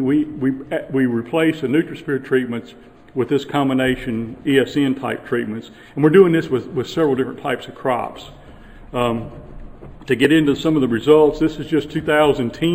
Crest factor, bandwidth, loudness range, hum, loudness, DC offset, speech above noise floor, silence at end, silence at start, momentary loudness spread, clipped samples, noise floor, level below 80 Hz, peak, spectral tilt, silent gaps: 18 dB; 15.5 kHz; 5 LU; none; -18 LUFS; under 0.1%; 22 dB; 0 s; 0 s; 13 LU; under 0.1%; -40 dBFS; -44 dBFS; 0 dBFS; -6.5 dB/octave; none